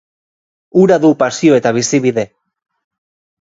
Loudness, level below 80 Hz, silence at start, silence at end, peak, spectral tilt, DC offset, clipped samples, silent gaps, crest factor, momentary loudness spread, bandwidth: -12 LUFS; -58 dBFS; 0.75 s; 1.15 s; 0 dBFS; -5.5 dB/octave; under 0.1%; under 0.1%; none; 14 dB; 8 LU; 7.8 kHz